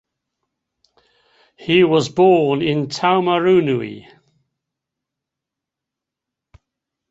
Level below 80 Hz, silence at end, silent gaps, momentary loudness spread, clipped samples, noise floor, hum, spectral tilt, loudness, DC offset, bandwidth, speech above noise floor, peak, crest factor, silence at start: -60 dBFS; 3.1 s; none; 9 LU; under 0.1%; -84 dBFS; none; -6 dB/octave; -16 LUFS; under 0.1%; 8 kHz; 69 dB; -2 dBFS; 18 dB; 1.6 s